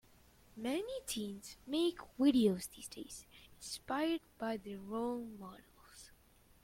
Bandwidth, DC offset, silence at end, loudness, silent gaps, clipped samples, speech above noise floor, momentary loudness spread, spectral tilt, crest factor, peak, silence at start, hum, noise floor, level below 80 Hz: 16.5 kHz; under 0.1%; 0.55 s; -38 LUFS; none; under 0.1%; 28 dB; 23 LU; -4.5 dB/octave; 20 dB; -20 dBFS; 0.55 s; none; -66 dBFS; -68 dBFS